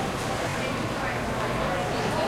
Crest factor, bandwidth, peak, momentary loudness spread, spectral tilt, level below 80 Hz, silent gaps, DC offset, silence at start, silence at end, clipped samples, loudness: 14 dB; 16.5 kHz; -14 dBFS; 2 LU; -4.5 dB/octave; -44 dBFS; none; under 0.1%; 0 s; 0 s; under 0.1%; -28 LUFS